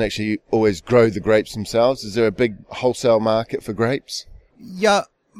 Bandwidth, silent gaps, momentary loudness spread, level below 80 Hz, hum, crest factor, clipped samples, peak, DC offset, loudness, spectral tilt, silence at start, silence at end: 15 kHz; none; 8 LU; -46 dBFS; none; 16 dB; under 0.1%; -4 dBFS; under 0.1%; -19 LUFS; -5.5 dB/octave; 0 s; 0 s